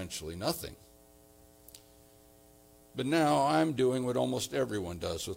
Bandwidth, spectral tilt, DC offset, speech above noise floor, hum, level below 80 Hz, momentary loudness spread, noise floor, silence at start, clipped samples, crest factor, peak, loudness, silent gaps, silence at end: 17 kHz; -5 dB/octave; under 0.1%; 28 dB; none; -62 dBFS; 12 LU; -59 dBFS; 0 s; under 0.1%; 18 dB; -16 dBFS; -31 LUFS; none; 0 s